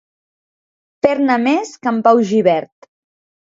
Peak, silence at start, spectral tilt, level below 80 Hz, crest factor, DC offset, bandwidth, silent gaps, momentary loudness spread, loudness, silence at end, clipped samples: 0 dBFS; 1.05 s; -6 dB/octave; -64 dBFS; 18 dB; under 0.1%; 7.8 kHz; none; 6 LU; -15 LUFS; 0.95 s; under 0.1%